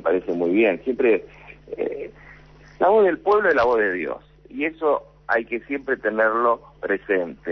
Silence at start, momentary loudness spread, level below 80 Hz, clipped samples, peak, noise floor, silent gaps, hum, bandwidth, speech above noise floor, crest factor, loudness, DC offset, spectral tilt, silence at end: 0.05 s; 11 LU; -54 dBFS; under 0.1%; -8 dBFS; -47 dBFS; none; none; 6.2 kHz; 26 dB; 14 dB; -21 LUFS; under 0.1%; -7 dB/octave; 0 s